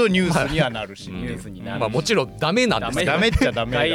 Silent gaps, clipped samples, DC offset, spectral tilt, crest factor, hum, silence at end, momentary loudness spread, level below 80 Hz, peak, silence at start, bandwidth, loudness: none; under 0.1%; under 0.1%; -5 dB/octave; 14 dB; none; 0 s; 13 LU; -36 dBFS; -6 dBFS; 0 s; 16 kHz; -21 LUFS